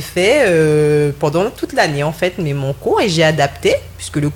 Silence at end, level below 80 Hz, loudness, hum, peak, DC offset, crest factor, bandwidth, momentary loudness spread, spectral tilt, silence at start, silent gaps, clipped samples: 0 s; -42 dBFS; -15 LUFS; none; 0 dBFS; under 0.1%; 14 dB; 18 kHz; 8 LU; -5.5 dB/octave; 0 s; none; under 0.1%